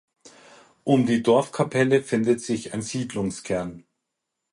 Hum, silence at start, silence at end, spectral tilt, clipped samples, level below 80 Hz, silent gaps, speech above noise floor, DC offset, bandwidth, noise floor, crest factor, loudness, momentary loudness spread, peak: none; 0.25 s; 0.75 s; -6 dB/octave; under 0.1%; -58 dBFS; none; 59 dB; under 0.1%; 11.5 kHz; -82 dBFS; 18 dB; -23 LUFS; 9 LU; -6 dBFS